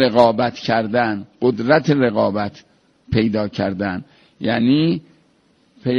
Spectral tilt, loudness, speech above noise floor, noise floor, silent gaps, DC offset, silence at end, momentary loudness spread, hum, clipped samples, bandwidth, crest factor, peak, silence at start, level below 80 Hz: -7.5 dB/octave; -19 LUFS; 41 dB; -58 dBFS; none; under 0.1%; 0 s; 11 LU; none; under 0.1%; 7.2 kHz; 18 dB; 0 dBFS; 0 s; -50 dBFS